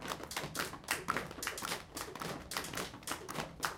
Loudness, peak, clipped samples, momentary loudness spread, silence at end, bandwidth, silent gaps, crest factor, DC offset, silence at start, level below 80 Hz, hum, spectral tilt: -40 LUFS; -16 dBFS; under 0.1%; 6 LU; 0 s; 17 kHz; none; 26 dB; under 0.1%; 0 s; -62 dBFS; none; -2.5 dB/octave